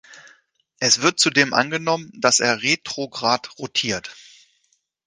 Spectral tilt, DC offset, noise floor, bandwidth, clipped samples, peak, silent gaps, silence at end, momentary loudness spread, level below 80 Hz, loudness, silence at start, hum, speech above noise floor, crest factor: -2 dB/octave; under 0.1%; -68 dBFS; 10.5 kHz; under 0.1%; 0 dBFS; none; 0.85 s; 9 LU; -62 dBFS; -19 LUFS; 0.1 s; none; 47 dB; 22 dB